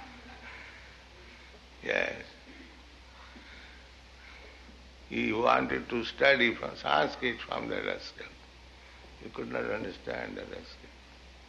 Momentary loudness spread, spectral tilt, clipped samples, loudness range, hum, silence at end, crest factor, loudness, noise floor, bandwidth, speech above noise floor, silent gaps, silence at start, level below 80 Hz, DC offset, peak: 26 LU; -4.5 dB/octave; under 0.1%; 11 LU; none; 0 s; 26 dB; -30 LUFS; -53 dBFS; 11.5 kHz; 21 dB; none; 0 s; -56 dBFS; under 0.1%; -8 dBFS